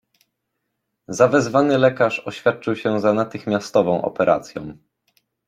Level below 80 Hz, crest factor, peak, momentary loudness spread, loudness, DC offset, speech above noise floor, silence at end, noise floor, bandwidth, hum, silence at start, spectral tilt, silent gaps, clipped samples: -60 dBFS; 18 dB; -2 dBFS; 9 LU; -19 LUFS; under 0.1%; 58 dB; 0.75 s; -76 dBFS; 12 kHz; none; 1.1 s; -6 dB/octave; none; under 0.1%